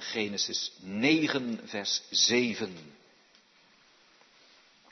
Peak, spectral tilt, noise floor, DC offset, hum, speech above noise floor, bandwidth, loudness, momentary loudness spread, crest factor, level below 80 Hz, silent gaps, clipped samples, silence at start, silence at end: -12 dBFS; -2.5 dB/octave; -62 dBFS; under 0.1%; none; 32 dB; 6.4 kHz; -28 LUFS; 12 LU; 20 dB; -78 dBFS; none; under 0.1%; 0 s; 2 s